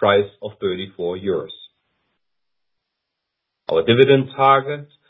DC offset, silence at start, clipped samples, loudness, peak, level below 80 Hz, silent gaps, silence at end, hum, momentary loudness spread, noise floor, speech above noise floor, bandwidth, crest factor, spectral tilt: under 0.1%; 0 s; under 0.1%; -18 LUFS; 0 dBFS; -56 dBFS; none; 0.25 s; none; 15 LU; -83 dBFS; 65 dB; 4 kHz; 20 dB; -9 dB/octave